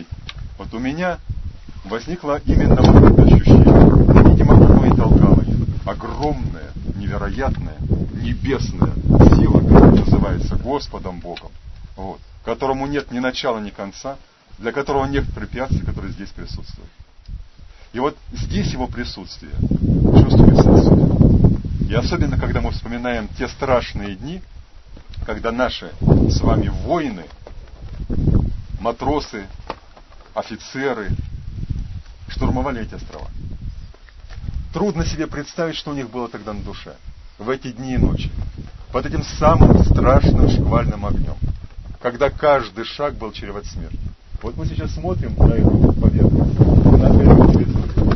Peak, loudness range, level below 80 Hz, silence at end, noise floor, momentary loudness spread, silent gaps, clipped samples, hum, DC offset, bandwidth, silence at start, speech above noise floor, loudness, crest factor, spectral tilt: 0 dBFS; 14 LU; -22 dBFS; 0 s; -42 dBFS; 23 LU; none; under 0.1%; none; under 0.1%; 6.2 kHz; 0 s; 26 dB; -16 LUFS; 16 dB; -8.5 dB/octave